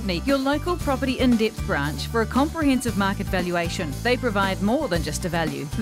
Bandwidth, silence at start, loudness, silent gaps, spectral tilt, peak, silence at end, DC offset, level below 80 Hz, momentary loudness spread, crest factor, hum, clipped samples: 16 kHz; 0 s; -23 LUFS; none; -5.5 dB/octave; -8 dBFS; 0 s; under 0.1%; -36 dBFS; 4 LU; 14 dB; none; under 0.1%